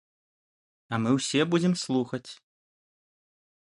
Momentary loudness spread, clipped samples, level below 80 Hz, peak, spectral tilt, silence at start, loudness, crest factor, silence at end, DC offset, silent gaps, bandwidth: 11 LU; under 0.1%; -70 dBFS; -10 dBFS; -5 dB/octave; 0.9 s; -27 LUFS; 20 dB; 1.3 s; under 0.1%; none; 11.5 kHz